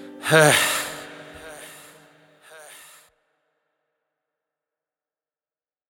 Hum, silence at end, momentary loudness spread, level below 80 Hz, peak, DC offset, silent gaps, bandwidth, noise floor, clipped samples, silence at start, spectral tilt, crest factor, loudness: none; 4.2 s; 26 LU; -66 dBFS; 0 dBFS; under 0.1%; none; 18.5 kHz; under -90 dBFS; under 0.1%; 0 s; -3 dB/octave; 26 dB; -18 LUFS